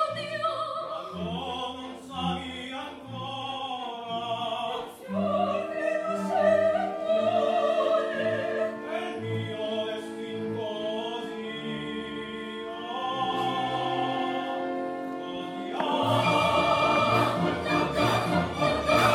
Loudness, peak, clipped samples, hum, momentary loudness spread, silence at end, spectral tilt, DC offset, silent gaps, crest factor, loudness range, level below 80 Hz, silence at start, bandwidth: -28 LUFS; -8 dBFS; under 0.1%; none; 12 LU; 0 s; -5.5 dB/octave; under 0.1%; none; 20 dB; 8 LU; -56 dBFS; 0 s; 16 kHz